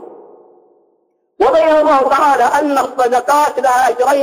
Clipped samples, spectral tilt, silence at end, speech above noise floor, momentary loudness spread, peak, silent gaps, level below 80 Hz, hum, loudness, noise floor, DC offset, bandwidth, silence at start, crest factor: under 0.1%; -2.5 dB/octave; 0 s; 49 dB; 4 LU; -4 dBFS; none; -52 dBFS; none; -12 LUFS; -61 dBFS; under 0.1%; 16 kHz; 0 s; 10 dB